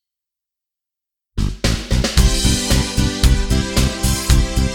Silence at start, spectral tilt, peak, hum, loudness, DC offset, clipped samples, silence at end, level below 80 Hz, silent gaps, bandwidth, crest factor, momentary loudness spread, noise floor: 1.35 s; -4 dB/octave; -2 dBFS; none; -17 LUFS; under 0.1%; under 0.1%; 0 s; -20 dBFS; none; 18.5 kHz; 16 dB; 5 LU; -85 dBFS